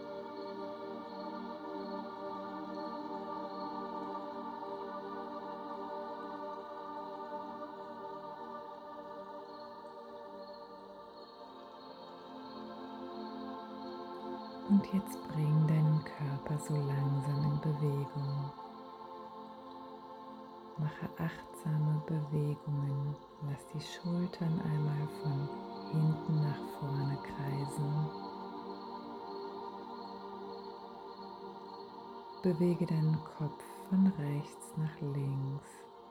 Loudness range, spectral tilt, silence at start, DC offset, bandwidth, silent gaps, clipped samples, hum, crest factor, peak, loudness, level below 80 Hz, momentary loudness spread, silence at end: 13 LU; -8 dB/octave; 0 s; under 0.1%; 12.5 kHz; none; under 0.1%; none; 18 dB; -18 dBFS; -38 LUFS; -70 dBFS; 17 LU; 0 s